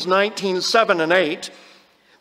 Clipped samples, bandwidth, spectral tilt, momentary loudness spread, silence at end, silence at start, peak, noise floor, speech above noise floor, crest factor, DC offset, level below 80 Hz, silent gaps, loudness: under 0.1%; 16 kHz; -3.5 dB/octave; 11 LU; 0.65 s; 0 s; -2 dBFS; -53 dBFS; 34 dB; 18 dB; under 0.1%; -74 dBFS; none; -18 LUFS